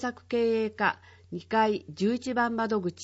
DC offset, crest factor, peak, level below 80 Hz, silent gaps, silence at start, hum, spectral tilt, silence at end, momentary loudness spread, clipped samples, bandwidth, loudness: under 0.1%; 18 dB; -10 dBFS; -66 dBFS; none; 0 s; none; -5.5 dB/octave; 0 s; 9 LU; under 0.1%; 8 kHz; -28 LUFS